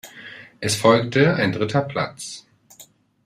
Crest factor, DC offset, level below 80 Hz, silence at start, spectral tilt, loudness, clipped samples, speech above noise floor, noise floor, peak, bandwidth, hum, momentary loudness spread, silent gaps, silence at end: 20 dB; under 0.1%; -58 dBFS; 0.05 s; -5 dB/octave; -20 LUFS; under 0.1%; 31 dB; -50 dBFS; -2 dBFS; 15.5 kHz; none; 22 LU; none; 0.4 s